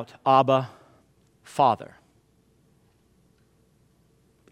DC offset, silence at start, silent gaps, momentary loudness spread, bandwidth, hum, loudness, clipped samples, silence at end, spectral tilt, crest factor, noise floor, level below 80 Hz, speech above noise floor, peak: under 0.1%; 0 s; none; 19 LU; 13 kHz; none; -23 LUFS; under 0.1%; 2.65 s; -6.5 dB/octave; 20 dB; -63 dBFS; -70 dBFS; 41 dB; -8 dBFS